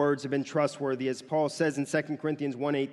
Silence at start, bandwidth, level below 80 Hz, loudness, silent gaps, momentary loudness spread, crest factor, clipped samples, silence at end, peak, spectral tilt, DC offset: 0 s; 12 kHz; -78 dBFS; -30 LUFS; none; 4 LU; 16 dB; under 0.1%; 0 s; -14 dBFS; -6 dB/octave; under 0.1%